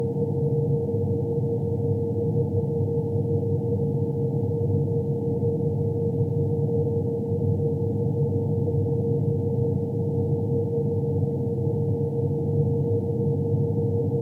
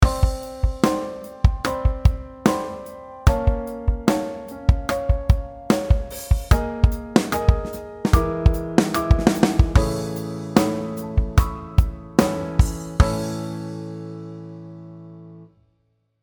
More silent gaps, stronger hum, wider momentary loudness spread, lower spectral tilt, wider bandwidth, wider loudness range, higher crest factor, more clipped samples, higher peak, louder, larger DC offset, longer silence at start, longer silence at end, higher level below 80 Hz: neither; neither; second, 1 LU vs 14 LU; first, -13 dB/octave vs -6.5 dB/octave; second, 1.1 kHz vs over 20 kHz; second, 0 LU vs 4 LU; second, 12 dB vs 20 dB; neither; second, -12 dBFS vs 0 dBFS; second, -25 LUFS vs -22 LUFS; neither; about the same, 0 s vs 0 s; second, 0 s vs 0.8 s; second, -56 dBFS vs -24 dBFS